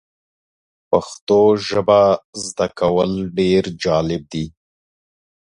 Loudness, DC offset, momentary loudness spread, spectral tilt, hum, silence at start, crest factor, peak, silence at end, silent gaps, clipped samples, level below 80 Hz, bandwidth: -18 LUFS; under 0.1%; 11 LU; -5.5 dB/octave; none; 0.9 s; 18 dB; 0 dBFS; 0.95 s; 1.21-1.27 s, 2.24-2.33 s; under 0.1%; -46 dBFS; 11 kHz